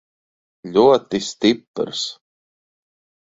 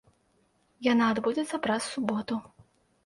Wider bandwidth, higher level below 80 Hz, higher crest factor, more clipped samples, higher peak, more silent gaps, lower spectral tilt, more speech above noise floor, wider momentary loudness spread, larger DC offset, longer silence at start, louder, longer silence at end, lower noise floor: second, 8 kHz vs 11.5 kHz; first, -60 dBFS vs -66 dBFS; about the same, 20 dB vs 20 dB; neither; first, -2 dBFS vs -10 dBFS; first, 1.67-1.74 s vs none; about the same, -4.5 dB/octave vs -4.5 dB/octave; first, over 72 dB vs 41 dB; first, 12 LU vs 8 LU; neither; second, 0.65 s vs 0.8 s; first, -19 LUFS vs -29 LUFS; first, 1.15 s vs 0.65 s; first, under -90 dBFS vs -69 dBFS